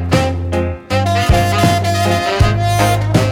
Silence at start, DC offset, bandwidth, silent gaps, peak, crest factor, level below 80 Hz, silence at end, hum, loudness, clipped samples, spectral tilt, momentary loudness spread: 0 s; under 0.1%; 17.5 kHz; none; 0 dBFS; 14 dB; -26 dBFS; 0 s; none; -14 LUFS; under 0.1%; -5.5 dB/octave; 5 LU